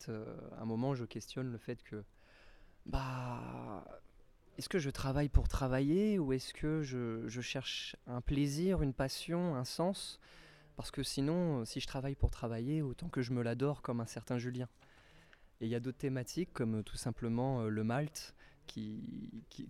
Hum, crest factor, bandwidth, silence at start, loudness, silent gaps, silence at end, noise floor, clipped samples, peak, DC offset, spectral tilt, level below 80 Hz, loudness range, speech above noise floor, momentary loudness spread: none; 24 dB; 15 kHz; 0 s; -38 LUFS; none; 0 s; -63 dBFS; under 0.1%; -14 dBFS; under 0.1%; -6 dB/octave; -48 dBFS; 7 LU; 25 dB; 14 LU